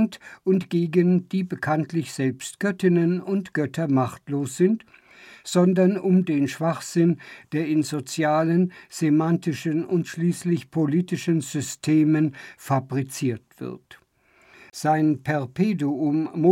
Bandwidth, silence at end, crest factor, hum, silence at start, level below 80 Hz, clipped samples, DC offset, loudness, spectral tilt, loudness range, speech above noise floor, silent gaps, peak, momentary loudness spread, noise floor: 15.5 kHz; 0 s; 16 dB; none; 0 s; -70 dBFS; under 0.1%; under 0.1%; -23 LUFS; -6.5 dB/octave; 3 LU; 37 dB; none; -8 dBFS; 8 LU; -60 dBFS